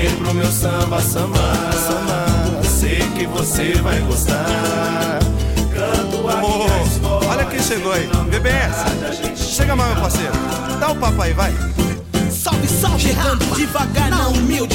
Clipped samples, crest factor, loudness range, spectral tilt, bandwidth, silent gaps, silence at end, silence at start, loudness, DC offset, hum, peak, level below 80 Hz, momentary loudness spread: under 0.1%; 12 dB; 1 LU; -4.5 dB/octave; 17 kHz; none; 0 s; 0 s; -17 LUFS; under 0.1%; none; -4 dBFS; -22 dBFS; 3 LU